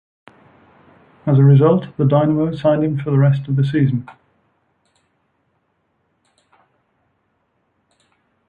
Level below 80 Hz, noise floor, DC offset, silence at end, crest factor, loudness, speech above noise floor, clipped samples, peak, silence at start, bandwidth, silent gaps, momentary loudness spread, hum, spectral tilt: -56 dBFS; -67 dBFS; under 0.1%; 4.4 s; 16 dB; -16 LUFS; 52 dB; under 0.1%; -2 dBFS; 1.25 s; 4.5 kHz; none; 7 LU; none; -11 dB/octave